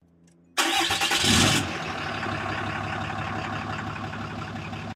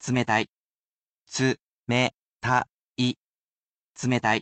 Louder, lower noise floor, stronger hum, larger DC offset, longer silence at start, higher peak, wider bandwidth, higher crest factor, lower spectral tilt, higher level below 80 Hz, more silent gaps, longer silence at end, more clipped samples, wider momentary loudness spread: about the same, -25 LUFS vs -26 LUFS; second, -58 dBFS vs under -90 dBFS; neither; neither; first, 0.55 s vs 0 s; first, -4 dBFS vs -8 dBFS; first, 16 kHz vs 9 kHz; about the same, 22 dB vs 20 dB; second, -2.5 dB/octave vs -4.5 dB/octave; first, -48 dBFS vs -62 dBFS; second, none vs 0.49-1.26 s, 1.61-1.86 s, 2.18-2.39 s, 2.73-2.95 s, 3.17-3.94 s; about the same, 0 s vs 0 s; neither; first, 14 LU vs 11 LU